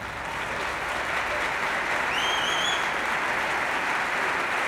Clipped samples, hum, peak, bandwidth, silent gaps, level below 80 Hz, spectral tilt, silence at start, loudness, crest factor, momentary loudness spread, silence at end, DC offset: under 0.1%; none; -12 dBFS; over 20 kHz; none; -52 dBFS; -2 dB/octave; 0 s; -25 LUFS; 14 dB; 5 LU; 0 s; under 0.1%